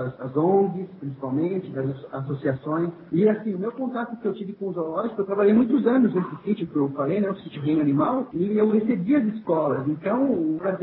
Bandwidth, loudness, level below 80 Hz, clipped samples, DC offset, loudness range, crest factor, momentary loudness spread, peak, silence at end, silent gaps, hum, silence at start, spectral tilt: 4.2 kHz; -24 LUFS; -64 dBFS; under 0.1%; under 0.1%; 4 LU; 16 dB; 10 LU; -8 dBFS; 0 s; none; none; 0 s; -12.5 dB/octave